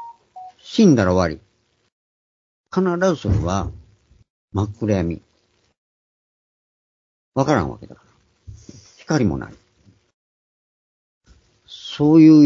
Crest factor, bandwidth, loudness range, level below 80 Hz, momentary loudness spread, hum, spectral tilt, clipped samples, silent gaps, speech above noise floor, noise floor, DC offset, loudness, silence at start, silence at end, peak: 20 dB; 7.4 kHz; 8 LU; -44 dBFS; 24 LU; none; -7 dB/octave; under 0.1%; 1.92-2.64 s, 4.30-4.48 s, 5.78-7.32 s, 10.14-11.21 s; 48 dB; -64 dBFS; under 0.1%; -19 LUFS; 0 s; 0 s; -2 dBFS